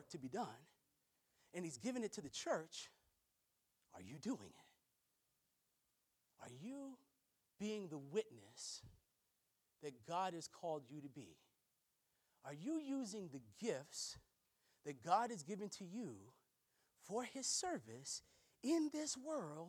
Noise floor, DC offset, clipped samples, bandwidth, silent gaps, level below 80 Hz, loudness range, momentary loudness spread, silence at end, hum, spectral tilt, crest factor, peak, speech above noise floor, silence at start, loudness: -86 dBFS; under 0.1%; under 0.1%; 19 kHz; none; -86 dBFS; 11 LU; 18 LU; 0 s; none; -3.5 dB/octave; 26 dB; -24 dBFS; 39 dB; 0 s; -47 LUFS